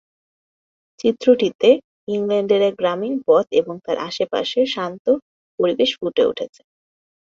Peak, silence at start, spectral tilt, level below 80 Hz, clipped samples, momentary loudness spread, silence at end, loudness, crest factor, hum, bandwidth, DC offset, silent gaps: -2 dBFS; 1.05 s; -5.5 dB/octave; -64 dBFS; under 0.1%; 9 LU; 0.75 s; -19 LUFS; 18 dB; none; 7.6 kHz; under 0.1%; 1.55-1.59 s, 1.84-2.07 s, 4.99-5.05 s, 5.22-5.58 s